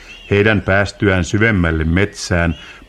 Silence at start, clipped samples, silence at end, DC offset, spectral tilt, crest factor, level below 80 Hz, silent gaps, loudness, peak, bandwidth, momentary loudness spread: 0 s; under 0.1%; 0.1 s; under 0.1%; -6 dB/octave; 16 dB; -30 dBFS; none; -15 LUFS; 0 dBFS; 11 kHz; 4 LU